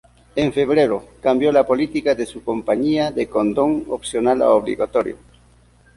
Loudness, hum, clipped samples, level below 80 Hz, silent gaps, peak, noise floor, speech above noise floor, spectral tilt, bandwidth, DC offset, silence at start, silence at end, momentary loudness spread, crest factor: -19 LUFS; none; under 0.1%; -48 dBFS; none; -2 dBFS; -52 dBFS; 34 dB; -6 dB/octave; 11.5 kHz; under 0.1%; 0.35 s; 0.85 s; 9 LU; 16 dB